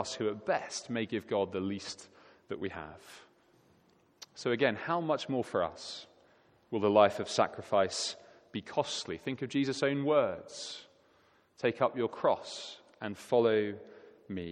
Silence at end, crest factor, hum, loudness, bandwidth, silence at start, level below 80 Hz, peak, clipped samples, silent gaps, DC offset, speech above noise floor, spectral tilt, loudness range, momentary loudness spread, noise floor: 0 s; 24 dB; none; -33 LUFS; 13 kHz; 0 s; -72 dBFS; -10 dBFS; under 0.1%; none; under 0.1%; 35 dB; -4.5 dB/octave; 7 LU; 17 LU; -67 dBFS